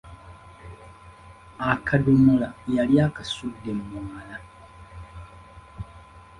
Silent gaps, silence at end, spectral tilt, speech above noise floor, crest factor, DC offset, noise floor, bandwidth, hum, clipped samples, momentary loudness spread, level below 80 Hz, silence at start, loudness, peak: none; 0.2 s; -7.5 dB/octave; 25 dB; 22 dB; under 0.1%; -47 dBFS; 11 kHz; none; under 0.1%; 27 LU; -48 dBFS; 0.05 s; -23 LUFS; -4 dBFS